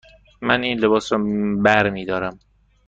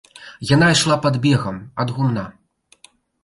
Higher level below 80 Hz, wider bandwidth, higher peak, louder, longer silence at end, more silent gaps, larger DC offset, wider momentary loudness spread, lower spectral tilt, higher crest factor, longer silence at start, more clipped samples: about the same, -50 dBFS vs -50 dBFS; second, 7.8 kHz vs 11.5 kHz; about the same, -2 dBFS vs -4 dBFS; about the same, -20 LUFS vs -18 LUFS; second, 0.5 s vs 0.95 s; neither; neither; second, 9 LU vs 14 LU; about the same, -5.5 dB/octave vs -5 dB/octave; about the same, 18 dB vs 16 dB; first, 0.4 s vs 0.2 s; neither